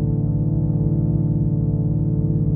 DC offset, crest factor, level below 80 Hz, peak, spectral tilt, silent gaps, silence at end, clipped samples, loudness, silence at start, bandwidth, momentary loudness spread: under 0.1%; 12 dB; -30 dBFS; -8 dBFS; -15.5 dB/octave; none; 0 s; under 0.1%; -20 LUFS; 0 s; 1.4 kHz; 1 LU